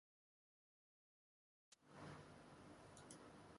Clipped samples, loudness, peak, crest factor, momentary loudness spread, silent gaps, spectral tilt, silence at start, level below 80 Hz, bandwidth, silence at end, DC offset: under 0.1%; -62 LUFS; -44 dBFS; 20 dB; 4 LU; none; -4.5 dB/octave; 1.7 s; -82 dBFS; 11.5 kHz; 0 s; under 0.1%